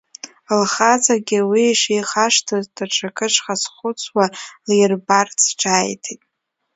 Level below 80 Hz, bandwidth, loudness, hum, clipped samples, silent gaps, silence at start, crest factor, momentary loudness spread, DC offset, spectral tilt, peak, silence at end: -68 dBFS; 8 kHz; -17 LUFS; none; under 0.1%; none; 0.25 s; 18 dB; 11 LU; under 0.1%; -2.5 dB/octave; 0 dBFS; 0.6 s